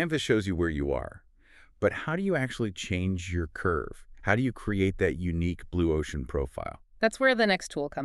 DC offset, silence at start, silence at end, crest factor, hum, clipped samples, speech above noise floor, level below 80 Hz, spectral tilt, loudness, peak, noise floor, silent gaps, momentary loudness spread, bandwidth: under 0.1%; 0 s; 0 s; 22 dB; none; under 0.1%; 29 dB; -44 dBFS; -6 dB/octave; -29 LUFS; -8 dBFS; -57 dBFS; none; 9 LU; 12.5 kHz